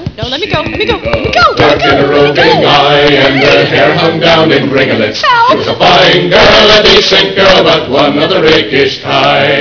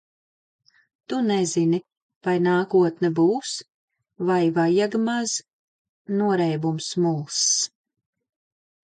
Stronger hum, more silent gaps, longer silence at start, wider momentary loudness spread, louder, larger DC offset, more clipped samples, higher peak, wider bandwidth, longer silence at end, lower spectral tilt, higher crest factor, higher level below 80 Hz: neither; second, none vs 2.02-2.09 s, 2.16-2.21 s, 3.74-3.88 s, 5.53-6.05 s; second, 0 s vs 1.1 s; about the same, 8 LU vs 9 LU; first, -6 LUFS vs -23 LUFS; neither; first, 4% vs under 0.1%; first, 0 dBFS vs -10 dBFS; second, 5.4 kHz vs 9.4 kHz; second, 0 s vs 1.15 s; about the same, -4.5 dB/octave vs -4.5 dB/octave; second, 6 dB vs 14 dB; first, -30 dBFS vs -72 dBFS